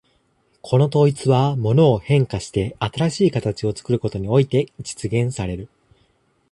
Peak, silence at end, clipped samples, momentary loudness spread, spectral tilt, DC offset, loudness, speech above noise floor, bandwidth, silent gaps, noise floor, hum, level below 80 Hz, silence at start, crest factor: -4 dBFS; 0.85 s; under 0.1%; 10 LU; -7 dB/octave; under 0.1%; -20 LUFS; 44 dB; 11.5 kHz; none; -63 dBFS; none; -46 dBFS; 0.65 s; 16 dB